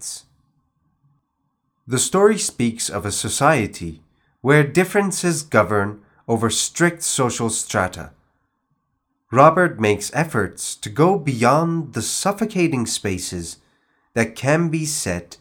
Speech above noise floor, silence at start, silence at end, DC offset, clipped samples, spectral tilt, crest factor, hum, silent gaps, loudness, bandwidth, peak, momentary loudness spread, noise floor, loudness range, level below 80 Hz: 53 dB; 0 s; 0.05 s; under 0.1%; under 0.1%; -4.5 dB/octave; 20 dB; none; none; -19 LUFS; 19.5 kHz; 0 dBFS; 11 LU; -72 dBFS; 4 LU; -56 dBFS